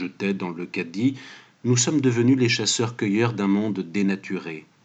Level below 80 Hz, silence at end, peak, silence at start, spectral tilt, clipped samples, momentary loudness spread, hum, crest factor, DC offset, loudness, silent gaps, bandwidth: -80 dBFS; 0.25 s; -8 dBFS; 0 s; -4.5 dB/octave; under 0.1%; 12 LU; none; 14 dB; under 0.1%; -23 LUFS; none; 9.4 kHz